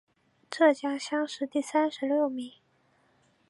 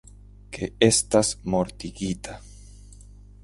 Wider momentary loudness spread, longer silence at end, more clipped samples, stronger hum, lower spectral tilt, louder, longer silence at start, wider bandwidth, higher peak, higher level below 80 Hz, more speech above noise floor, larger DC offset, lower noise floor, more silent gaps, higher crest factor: second, 14 LU vs 19 LU; first, 1 s vs 0.5 s; neither; second, none vs 50 Hz at -45 dBFS; about the same, -3 dB/octave vs -4 dB/octave; second, -28 LUFS vs -24 LUFS; about the same, 0.5 s vs 0.5 s; about the same, 11.5 kHz vs 11.5 kHz; second, -10 dBFS vs -4 dBFS; second, -86 dBFS vs -46 dBFS; first, 40 dB vs 22 dB; neither; first, -68 dBFS vs -46 dBFS; neither; about the same, 20 dB vs 22 dB